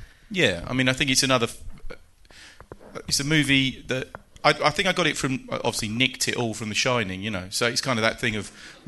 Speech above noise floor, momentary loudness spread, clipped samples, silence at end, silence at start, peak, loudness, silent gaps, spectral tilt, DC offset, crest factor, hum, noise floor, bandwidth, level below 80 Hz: 25 dB; 11 LU; under 0.1%; 0.15 s; 0 s; -4 dBFS; -23 LUFS; none; -3.5 dB/octave; under 0.1%; 20 dB; none; -49 dBFS; 12 kHz; -48 dBFS